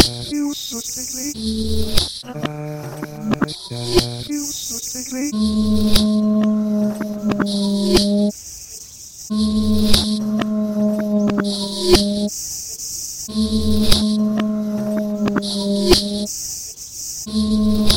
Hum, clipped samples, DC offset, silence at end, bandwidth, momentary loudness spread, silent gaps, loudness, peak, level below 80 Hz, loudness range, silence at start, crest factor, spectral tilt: none; under 0.1%; under 0.1%; 0 s; 17 kHz; 11 LU; none; -19 LUFS; 0 dBFS; -32 dBFS; 4 LU; 0 s; 18 dB; -4.5 dB/octave